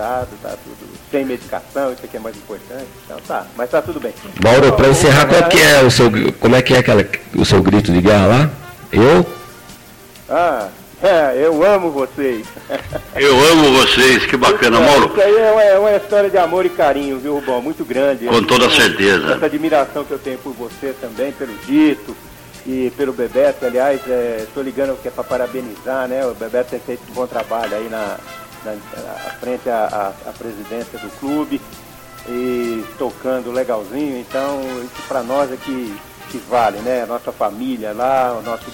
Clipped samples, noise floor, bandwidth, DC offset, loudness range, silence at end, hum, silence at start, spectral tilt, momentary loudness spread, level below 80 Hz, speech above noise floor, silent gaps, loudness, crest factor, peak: under 0.1%; -40 dBFS; 17 kHz; under 0.1%; 13 LU; 0 s; none; 0 s; -4.5 dB/octave; 19 LU; -40 dBFS; 25 dB; none; -14 LUFS; 14 dB; -2 dBFS